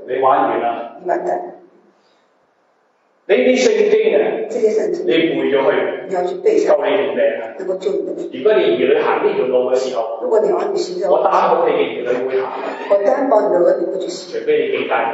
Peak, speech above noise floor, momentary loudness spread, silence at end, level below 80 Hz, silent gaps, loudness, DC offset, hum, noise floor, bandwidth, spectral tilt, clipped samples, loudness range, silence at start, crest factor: -2 dBFS; 43 dB; 9 LU; 0 s; -78 dBFS; none; -16 LUFS; under 0.1%; none; -59 dBFS; 8 kHz; -4.5 dB/octave; under 0.1%; 2 LU; 0 s; 14 dB